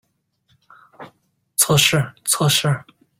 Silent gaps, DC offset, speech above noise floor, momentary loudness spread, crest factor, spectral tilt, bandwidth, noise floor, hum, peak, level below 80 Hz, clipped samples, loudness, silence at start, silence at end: none; under 0.1%; 47 dB; 11 LU; 20 dB; -3 dB/octave; 16.5 kHz; -65 dBFS; none; 0 dBFS; -54 dBFS; under 0.1%; -17 LUFS; 1 s; 0.4 s